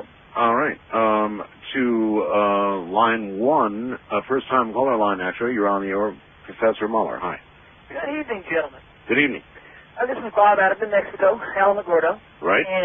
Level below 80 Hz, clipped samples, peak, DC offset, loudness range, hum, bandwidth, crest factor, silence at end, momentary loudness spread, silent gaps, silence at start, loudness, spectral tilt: -58 dBFS; under 0.1%; -4 dBFS; under 0.1%; 5 LU; none; 3.7 kHz; 18 dB; 0 s; 10 LU; none; 0 s; -21 LUFS; -3 dB/octave